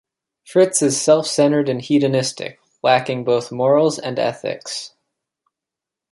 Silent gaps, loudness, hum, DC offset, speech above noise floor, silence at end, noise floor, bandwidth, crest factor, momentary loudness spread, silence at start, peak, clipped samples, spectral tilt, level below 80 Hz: none; -18 LUFS; none; under 0.1%; 68 dB; 1.25 s; -86 dBFS; 11.5 kHz; 18 dB; 13 LU; 0.5 s; -2 dBFS; under 0.1%; -4.5 dB/octave; -66 dBFS